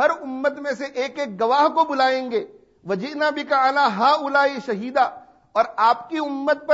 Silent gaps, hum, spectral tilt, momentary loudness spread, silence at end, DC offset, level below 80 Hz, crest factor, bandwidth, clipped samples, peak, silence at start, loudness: none; none; -4.5 dB/octave; 9 LU; 0 s; under 0.1%; -70 dBFS; 16 dB; 8 kHz; under 0.1%; -4 dBFS; 0 s; -21 LUFS